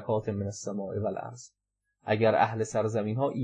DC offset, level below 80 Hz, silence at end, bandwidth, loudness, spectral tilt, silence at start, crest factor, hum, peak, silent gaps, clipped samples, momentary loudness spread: under 0.1%; -70 dBFS; 0 s; 10 kHz; -29 LUFS; -6 dB/octave; 0 s; 18 dB; none; -12 dBFS; none; under 0.1%; 16 LU